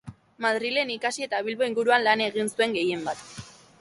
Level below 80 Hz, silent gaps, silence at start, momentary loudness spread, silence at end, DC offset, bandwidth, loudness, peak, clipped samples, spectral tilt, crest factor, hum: -66 dBFS; none; 0.05 s; 12 LU; 0.3 s; under 0.1%; 11.5 kHz; -25 LUFS; -8 dBFS; under 0.1%; -3 dB/octave; 18 dB; none